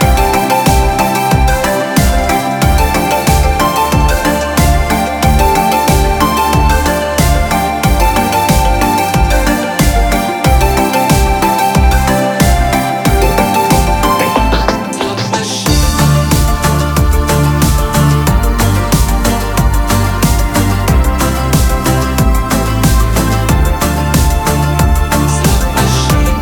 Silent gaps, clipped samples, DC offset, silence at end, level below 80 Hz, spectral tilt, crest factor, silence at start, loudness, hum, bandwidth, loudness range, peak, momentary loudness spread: none; under 0.1%; under 0.1%; 0 s; -14 dBFS; -5 dB/octave; 10 dB; 0 s; -11 LUFS; none; over 20 kHz; 1 LU; 0 dBFS; 3 LU